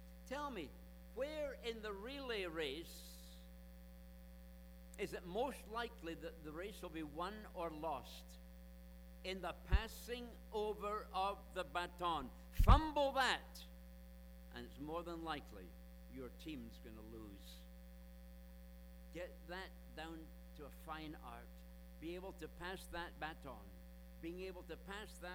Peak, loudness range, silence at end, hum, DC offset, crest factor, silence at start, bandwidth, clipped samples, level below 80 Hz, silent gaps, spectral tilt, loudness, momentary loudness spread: -16 dBFS; 15 LU; 0 s; none; under 0.1%; 30 dB; 0 s; over 20 kHz; under 0.1%; -48 dBFS; none; -5.5 dB/octave; -45 LUFS; 18 LU